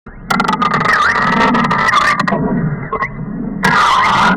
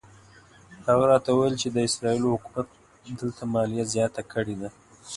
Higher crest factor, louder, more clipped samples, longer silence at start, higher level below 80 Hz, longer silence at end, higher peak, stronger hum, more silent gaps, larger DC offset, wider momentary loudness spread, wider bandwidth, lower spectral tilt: second, 8 dB vs 20 dB; first, -13 LUFS vs -25 LUFS; neither; second, 0.05 s vs 0.7 s; first, -36 dBFS vs -58 dBFS; about the same, 0 s vs 0 s; about the same, -4 dBFS vs -6 dBFS; neither; neither; neither; second, 10 LU vs 14 LU; first, 17 kHz vs 11.5 kHz; about the same, -5 dB/octave vs -5 dB/octave